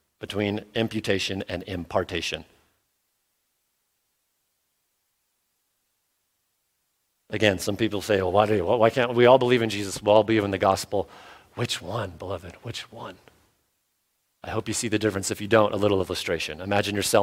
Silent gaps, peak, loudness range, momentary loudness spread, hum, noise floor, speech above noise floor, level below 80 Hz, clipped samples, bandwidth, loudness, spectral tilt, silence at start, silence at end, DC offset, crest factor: none; -4 dBFS; 13 LU; 16 LU; none; -75 dBFS; 51 dB; -58 dBFS; under 0.1%; 16.5 kHz; -24 LUFS; -4.5 dB/octave; 0.2 s; 0 s; under 0.1%; 22 dB